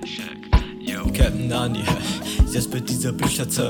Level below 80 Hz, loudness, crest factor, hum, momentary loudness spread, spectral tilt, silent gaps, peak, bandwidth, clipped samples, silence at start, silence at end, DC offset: -26 dBFS; -23 LUFS; 18 dB; none; 6 LU; -4.5 dB/octave; none; -4 dBFS; 19 kHz; under 0.1%; 0 s; 0 s; under 0.1%